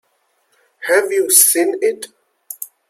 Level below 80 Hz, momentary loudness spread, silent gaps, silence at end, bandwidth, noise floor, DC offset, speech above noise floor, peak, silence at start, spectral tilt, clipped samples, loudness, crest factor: -76 dBFS; 22 LU; none; 0.25 s; 16.5 kHz; -64 dBFS; under 0.1%; 49 dB; 0 dBFS; 0.8 s; 0.5 dB/octave; under 0.1%; -13 LUFS; 18 dB